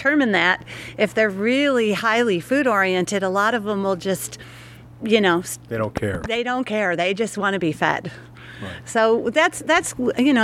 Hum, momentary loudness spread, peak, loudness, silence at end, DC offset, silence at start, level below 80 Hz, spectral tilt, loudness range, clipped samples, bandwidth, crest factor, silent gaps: none; 14 LU; -2 dBFS; -20 LUFS; 0 s; under 0.1%; 0 s; -52 dBFS; -4.5 dB/octave; 4 LU; under 0.1%; 15.5 kHz; 18 dB; none